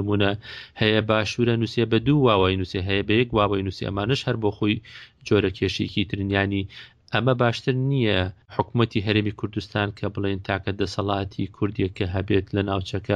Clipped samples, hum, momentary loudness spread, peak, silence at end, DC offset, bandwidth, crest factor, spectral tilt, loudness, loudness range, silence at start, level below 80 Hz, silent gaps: under 0.1%; none; 8 LU; -4 dBFS; 0 s; under 0.1%; 8.8 kHz; 18 dB; -6.5 dB/octave; -24 LUFS; 4 LU; 0 s; -48 dBFS; none